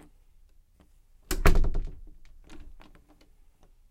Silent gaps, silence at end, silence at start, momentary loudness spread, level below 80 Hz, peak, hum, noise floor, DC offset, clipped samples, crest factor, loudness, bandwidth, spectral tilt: none; 1.2 s; 1.3 s; 28 LU; -30 dBFS; -6 dBFS; none; -59 dBFS; under 0.1%; under 0.1%; 22 dB; -29 LUFS; 15.5 kHz; -5 dB/octave